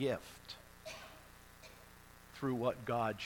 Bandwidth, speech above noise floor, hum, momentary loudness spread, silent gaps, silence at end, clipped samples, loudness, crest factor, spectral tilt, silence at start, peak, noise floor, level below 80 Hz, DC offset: 19 kHz; 21 dB; 60 Hz at -65 dBFS; 21 LU; none; 0 s; under 0.1%; -41 LUFS; 20 dB; -5.5 dB/octave; 0 s; -22 dBFS; -59 dBFS; -66 dBFS; under 0.1%